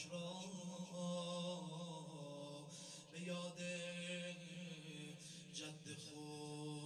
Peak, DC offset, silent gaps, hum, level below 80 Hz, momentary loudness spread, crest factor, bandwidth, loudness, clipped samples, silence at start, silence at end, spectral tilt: -34 dBFS; under 0.1%; none; none; under -90 dBFS; 7 LU; 16 dB; 13 kHz; -50 LUFS; under 0.1%; 0 s; 0 s; -4.5 dB/octave